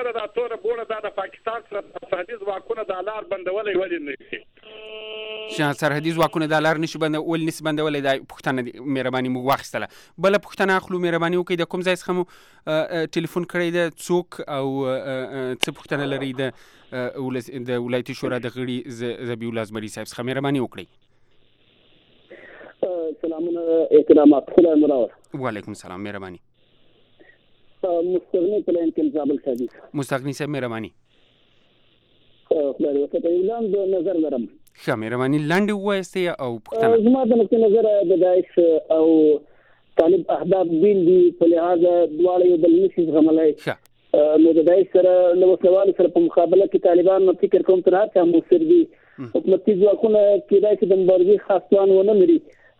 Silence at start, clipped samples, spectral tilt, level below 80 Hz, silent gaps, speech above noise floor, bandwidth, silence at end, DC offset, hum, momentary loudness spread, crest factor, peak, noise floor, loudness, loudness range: 0 s; under 0.1%; -6.5 dB/octave; -62 dBFS; none; 39 dB; 16.5 kHz; 0.4 s; under 0.1%; none; 14 LU; 20 dB; 0 dBFS; -58 dBFS; -20 LUFS; 11 LU